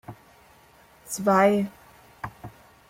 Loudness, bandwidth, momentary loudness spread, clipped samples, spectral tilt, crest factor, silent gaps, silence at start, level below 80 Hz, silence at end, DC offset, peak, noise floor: -23 LUFS; 16.5 kHz; 26 LU; under 0.1%; -5.5 dB/octave; 20 dB; none; 0.1 s; -60 dBFS; 0.4 s; under 0.1%; -8 dBFS; -55 dBFS